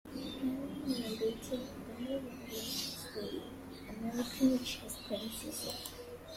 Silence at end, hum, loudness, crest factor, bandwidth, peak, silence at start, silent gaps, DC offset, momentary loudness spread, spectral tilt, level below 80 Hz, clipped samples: 0 s; none; -39 LUFS; 20 dB; 16.5 kHz; -18 dBFS; 0.05 s; none; under 0.1%; 12 LU; -4 dB/octave; -62 dBFS; under 0.1%